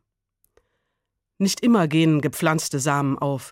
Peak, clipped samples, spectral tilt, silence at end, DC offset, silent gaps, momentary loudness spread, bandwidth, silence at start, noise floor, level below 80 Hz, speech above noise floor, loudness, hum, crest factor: -6 dBFS; under 0.1%; -5.5 dB/octave; 0 s; under 0.1%; none; 6 LU; 16.5 kHz; 1.4 s; -79 dBFS; -64 dBFS; 59 dB; -21 LUFS; none; 16 dB